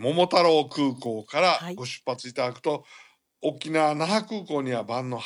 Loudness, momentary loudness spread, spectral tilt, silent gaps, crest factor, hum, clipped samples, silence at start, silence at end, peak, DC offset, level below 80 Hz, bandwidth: -25 LUFS; 12 LU; -5 dB/octave; none; 20 dB; none; under 0.1%; 0 s; 0 s; -6 dBFS; under 0.1%; -80 dBFS; 12 kHz